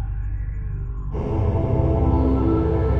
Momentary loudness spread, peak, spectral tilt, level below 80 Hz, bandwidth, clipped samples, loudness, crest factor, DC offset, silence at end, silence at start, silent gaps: 10 LU; -8 dBFS; -11 dB/octave; -26 dBFS; 4.5 kHz; under 0.1%; -22 LUFS; 12 dB; under 0.1%; 0 s; 0 s; none